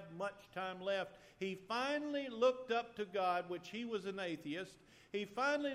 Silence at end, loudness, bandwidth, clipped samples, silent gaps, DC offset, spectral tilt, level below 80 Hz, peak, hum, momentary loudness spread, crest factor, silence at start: 0 s; -40 LUFS; 14 kHz; under 0.1%; none; under 0.1%; -4.5 dB/octave; -78 dBFS; -22 dBFS; none; 10 LU; 18 dB; 0 s